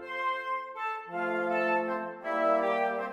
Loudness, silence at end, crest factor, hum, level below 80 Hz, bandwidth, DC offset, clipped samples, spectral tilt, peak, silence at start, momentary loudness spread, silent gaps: -30 LUFS; 0 s; 14 dB; none; -80 dBFS; 12.5 kHz; under 0.1%; under 0.1%; -5.5 dB/octave; -16 dBFS; 0 s; 8 LU; none